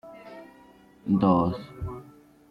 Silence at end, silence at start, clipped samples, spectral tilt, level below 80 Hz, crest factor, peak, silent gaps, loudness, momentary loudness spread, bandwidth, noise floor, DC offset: 0.5 s; 0.05 s; under 0.1%; -10 dB/octave; -52 dBFS; 20 dB; -8 dBFS; none; -26 LUFS; 23 LU; 5.4 kHz; -54 dBFS; under 0.1%